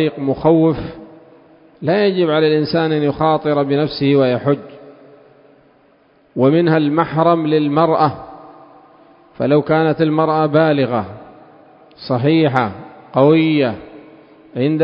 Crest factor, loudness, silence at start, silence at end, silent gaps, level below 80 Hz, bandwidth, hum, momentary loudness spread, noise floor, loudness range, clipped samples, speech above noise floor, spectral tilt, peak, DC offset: 16 dB; -15 LUFS; 0 s; 0 s; none; -50 dBFS; 5.4 kHz; none; 11 LU; -53 dBFS; 2 LU; under 0.1%; 38 dB; -10 dB/octave; 0 dBFS; under 0.1%